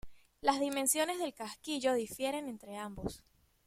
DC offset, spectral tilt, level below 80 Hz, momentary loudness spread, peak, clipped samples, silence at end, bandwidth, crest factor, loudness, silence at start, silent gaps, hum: under 0.1%; -2.5 dB/octave; -60 dBFS; 13 LU; -14 dBFS; under 0.1%; 0.45 s; 16.5 kHz; 22 dB; -35 LUFS; 0.05 s; none; none